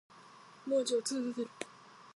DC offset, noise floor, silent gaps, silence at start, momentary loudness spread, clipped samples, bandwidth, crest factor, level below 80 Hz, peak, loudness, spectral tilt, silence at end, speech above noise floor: under 0.1%; -57 dBFS; none; 0.15 s; 24 LU; under 0.1%; 11.5 kHz; 16 dB; -88 dBFS; -20 dBFS; -35 LUFS; -2.5 dB/octave; 0.05 s; 23 dB